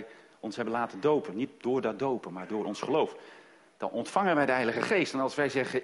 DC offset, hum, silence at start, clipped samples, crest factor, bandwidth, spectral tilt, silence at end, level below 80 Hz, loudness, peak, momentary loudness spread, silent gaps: under 0.1%; none; 0 s; under 0.1%; 20 dB; 11.5 kHz; -5.5 dB/octave; 0 s; -72 dBFS; -30 LUFS; -10 dBFS; 10 LU; none